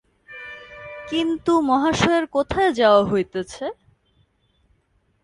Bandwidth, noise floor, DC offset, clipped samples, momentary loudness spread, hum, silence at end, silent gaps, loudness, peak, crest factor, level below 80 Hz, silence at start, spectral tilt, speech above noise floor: 11 kHz; -65 dBFS; under 0.1%; under 0.1%; 21 LU; none; 1.5 s; none; -20 LUFS; -4 dBFS; 18 dB; -48 dBFS; 0.3 s; -5 dB/octave; 46 dB